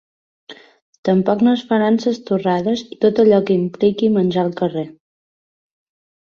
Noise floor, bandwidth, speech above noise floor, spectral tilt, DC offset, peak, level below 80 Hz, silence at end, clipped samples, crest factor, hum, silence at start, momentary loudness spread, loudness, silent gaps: under -90 dBFS; 7 kHz; over 74 dB; -7.5 dB/octave; under 0.1%; -2 dBFS; -60 dBFS; 1.5 s; under 0.1%; 16 dB; none; 0.5 s; 8 LU; -17 LUFS; 0.82-1.03 s